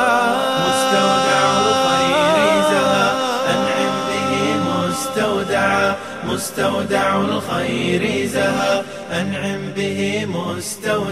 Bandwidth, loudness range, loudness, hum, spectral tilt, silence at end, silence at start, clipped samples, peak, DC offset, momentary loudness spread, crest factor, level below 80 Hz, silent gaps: 15 kHz; 5 LU; -18 LUFS; none; -4 dB/octave; 0 s; 0 s; under 0.1%; -4 dBFS; 0.3%; 8 LU; 14 dB; -54 dBFS; none